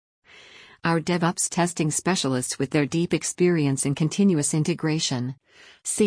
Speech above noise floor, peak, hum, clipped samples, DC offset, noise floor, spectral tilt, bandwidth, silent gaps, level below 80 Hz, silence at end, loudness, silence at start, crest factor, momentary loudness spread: 25 dB; -10 dBFS; none; under 0.1%; under 0.1%; -49 dBFS; -4.5 dB/octave; 10.5 kHz; none; -62 dBFS; 0 s; -24 LUFS; 0.85 s; 14 dB; 8 LU